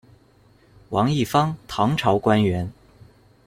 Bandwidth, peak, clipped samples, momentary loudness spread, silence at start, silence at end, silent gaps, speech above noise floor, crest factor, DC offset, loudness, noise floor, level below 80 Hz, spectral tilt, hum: 16 kHz; -4 dBFS; under 0.1%; 9 LU; 0.9 s; 0.75 s; none; 35 dB; 18 dB; under 0.1%; -21 LUFS; -55 dBFS; -52 dBFS; -6.5 dB/octave; none